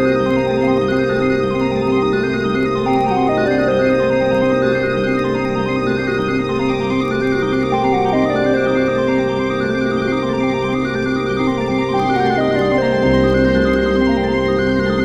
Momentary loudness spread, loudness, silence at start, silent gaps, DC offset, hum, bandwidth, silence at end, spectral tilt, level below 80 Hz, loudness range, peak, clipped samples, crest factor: 3 LU; -16 LUFS; 0 s; none; under 0.1%; none; 9.2 kHz; 0 s; -7 dB/octave; -36 dBFS; 2 LU; -2 dBFS; under 0.1%; 12 dB